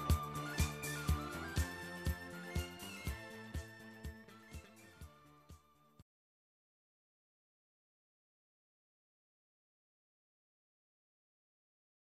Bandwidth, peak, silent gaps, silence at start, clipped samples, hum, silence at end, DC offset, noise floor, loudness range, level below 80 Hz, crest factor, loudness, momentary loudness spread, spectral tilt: 14.5 kHz; -20 dBFS; none; 0 s; under 0.1%; none; 6.05 s; under 0.1%; -64 dBFS; 20 LU; -50 dBFS; 26 dB; -43 LUFS; 20 LU; -4.5 dB/octave